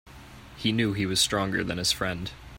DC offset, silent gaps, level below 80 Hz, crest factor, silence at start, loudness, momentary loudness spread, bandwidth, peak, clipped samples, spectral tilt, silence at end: under 0.1%; none; -50 dBFS; 20 dB; 0.05 s; -26 LUFS; 8 LU; 16.5 kHz; -10 dBFS; under 0.1%; -3.5 dB/octave; 0 s